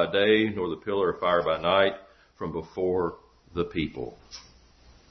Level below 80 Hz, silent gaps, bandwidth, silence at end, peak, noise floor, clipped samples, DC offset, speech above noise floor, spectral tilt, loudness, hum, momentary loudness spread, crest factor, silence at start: -56 dBFS; none; 6.4 kHz; 0.7 s; -6 dBFS; -56 dBFS; under 0.1%; under 0.1%; 29 dB; -6 dB/octave; -26 LUFS; none; 17 LU; 20 dB; 0 s